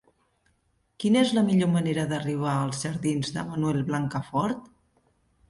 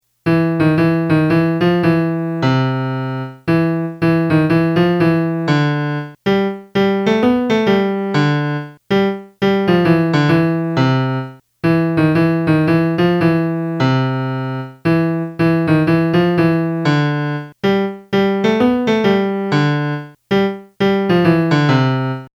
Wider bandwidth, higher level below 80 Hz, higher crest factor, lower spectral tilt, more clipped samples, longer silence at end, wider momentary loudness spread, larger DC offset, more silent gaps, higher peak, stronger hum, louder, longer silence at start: about the same, 11.5 kHz vs 12 kHz; second, -60 dBFS vs -50 dBFS; about the same, 18 dB vs 14 dB; second, -6 dB/octave vs -8 dB/octave; neither; first, 0.85 s vs 0.1 s; about the same, 8 LU vs 7 LU; neither; neither; second, -10 dBFS vs 0 dBFS; neither; second, -26 LUFS vs -16 LUFS; first, 1 s vs 0.25 s